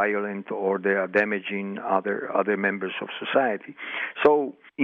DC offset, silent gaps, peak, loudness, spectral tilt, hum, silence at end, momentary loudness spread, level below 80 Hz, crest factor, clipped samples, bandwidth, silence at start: under 0.1%; none; -6 dBFS; -25 LUFS; -7.5 dB/octave; none; 0 s; 10 LU; -74 dBFS; 20 dB; under 0.1%; 5.4 kHz; 0 s